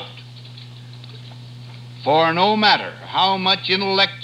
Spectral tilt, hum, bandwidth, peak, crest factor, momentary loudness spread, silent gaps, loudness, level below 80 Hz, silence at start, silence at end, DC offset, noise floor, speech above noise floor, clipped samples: -5 dB/octave; none; 11 kHz; -2 dBFS; 18 dB; 23 LU; none; -17 LUFS; -64 dBFS; 0 s; 0 s; under 0.1%; -38 dBFS; 20 dB; under 0.1%